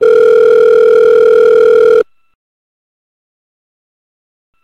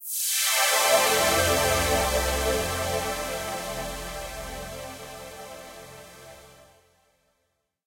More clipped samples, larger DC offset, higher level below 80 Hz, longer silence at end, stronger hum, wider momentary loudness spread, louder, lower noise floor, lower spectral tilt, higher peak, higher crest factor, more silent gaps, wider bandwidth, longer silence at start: neither; neither; second, -52 dBFS vs -42 dBFS; first, 2.6 s vs 1.3 s; neither; second, 3 LU vs 21 LU; first, -7 LUFS vs -24 LUFS; first, under -90 dBFS vs -76 dBFS; first, -4.5 dB/octave vs -2 dB/octave; first, -2 dBFS vs -8 dBFS; second, 8 dB vs 18 dB; neither; second, 6.4 kHz vs 16.5 kHz; about the same, 0 s vs 0 s